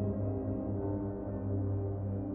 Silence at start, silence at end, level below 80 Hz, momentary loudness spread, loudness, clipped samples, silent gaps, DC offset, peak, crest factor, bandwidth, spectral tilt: 0 s; 0 s; -50 dBFS; 3 LU; -36 LUFS; under 0.1%; none; under 0.1%; -24 dBFS; 12 dB; 2.1 kHz; -11 dB/octave